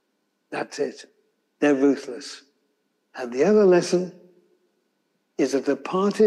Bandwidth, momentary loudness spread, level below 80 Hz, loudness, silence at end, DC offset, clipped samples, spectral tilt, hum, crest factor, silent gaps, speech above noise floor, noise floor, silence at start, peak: 12 kHz; 19 LU; -78 dBFS; -22 LUFS; 0 s; under 0.1%; under 0.1%; -5.5 dB/octave; none; 16 dB; none; 52 dB; -73 dBFS; 0.5 s; -8 dBFS